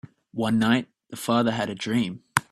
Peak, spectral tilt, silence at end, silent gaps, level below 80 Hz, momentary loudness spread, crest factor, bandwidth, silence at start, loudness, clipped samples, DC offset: 0 dBFS; -5 dB/octave; 0.1 s; none; -60 dBFS; 11 LU; 24 dB; 13.5 kHz; 0.35 s; -25 LUFS; under 0.1%; under 0.1%